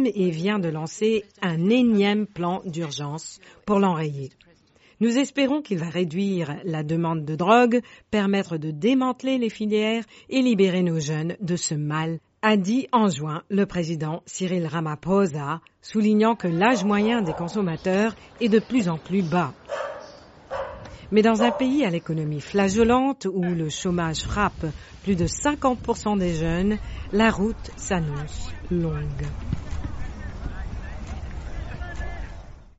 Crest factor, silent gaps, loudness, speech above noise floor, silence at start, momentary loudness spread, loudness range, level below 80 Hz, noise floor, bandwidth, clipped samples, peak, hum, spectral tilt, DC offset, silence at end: 18 dB; none; -24 LUFS; 34 dB; 0 s; 15 LU; 4 LU; -40 dBFS; -57 dBFS; 8 kHz; under 0.1%; -6 dBFS; none; -5.5 dB/octave; under 0.1%; 0.1 s